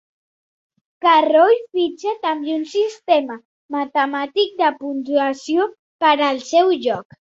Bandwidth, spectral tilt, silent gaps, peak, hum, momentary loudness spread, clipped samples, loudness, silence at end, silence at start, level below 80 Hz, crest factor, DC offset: 8 kHz; -3.5 dB/octave; 3.45-3.69 s, 5.79-5.99 s; -2 dBFS; none; 11 LU; under 0.1%; -18 LUFS; 0.35 s; 1 s; -68 dBFS; 18 dB; under 0.1%